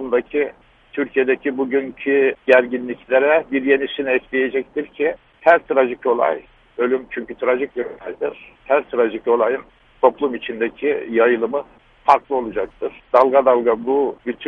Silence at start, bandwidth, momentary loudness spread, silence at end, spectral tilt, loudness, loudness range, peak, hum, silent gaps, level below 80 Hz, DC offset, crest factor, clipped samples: 0 s; 5.4 kHz; 12 LU; 0 s; -6.5 dB/octave; -19 LUFS; 3 LU; 0 dBFS; none; none; -56 dBFS; under 0.1%; 18 dB; under 0.1%